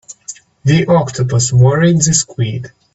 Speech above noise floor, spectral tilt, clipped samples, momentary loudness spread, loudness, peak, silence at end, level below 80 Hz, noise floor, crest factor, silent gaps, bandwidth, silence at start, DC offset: 23 dB; -5 dB/octave; under 0.1%; 18 LU; -13 LUFS; 0 dBFS; 0.3 s; -44 dBFS; -35 dBFS; 14 dB; none; 8.2 kHz; 0.1 s; under 0.1%